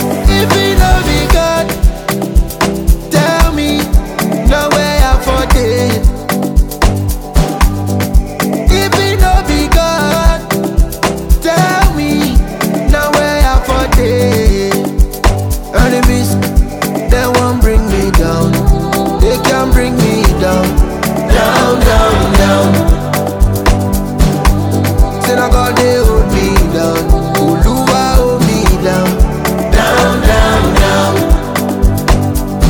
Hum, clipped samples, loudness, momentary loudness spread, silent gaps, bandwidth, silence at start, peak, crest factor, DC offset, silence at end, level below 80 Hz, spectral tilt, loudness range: none; 0.3%; -11 LUFS; 5 LU; none; 19.5 kHz; 0 s; 0 dBFS; 10 dB; under 0.1%; 0 s; -12 dBFS; -5.5 dB/octave; 2 LU